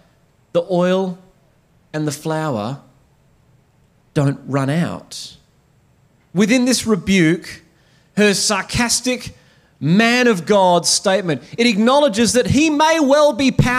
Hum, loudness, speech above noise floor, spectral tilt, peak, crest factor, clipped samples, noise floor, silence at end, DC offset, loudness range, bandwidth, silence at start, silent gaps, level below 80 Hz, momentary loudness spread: none; -16 LUFS; 40 dB; -4.5 dB/octave; -2 dBFS; 16 dB; under 0.1%; -56 dBFS; 0 s; under 0.1%; 10 LU; 16 kHz; 0.55 s; none; -46 dBFS; 13 LU